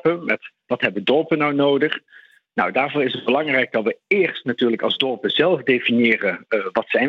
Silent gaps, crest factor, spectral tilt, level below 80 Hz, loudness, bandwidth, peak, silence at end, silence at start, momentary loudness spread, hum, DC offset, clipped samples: none; 18 dB; -7 dB/octave; -68 dBFS; -20 LUFS; 6.8 kHz; -2 dBFS; 0 s; 0.05 s; 6 LU; none; under 0.1%; under 0.1%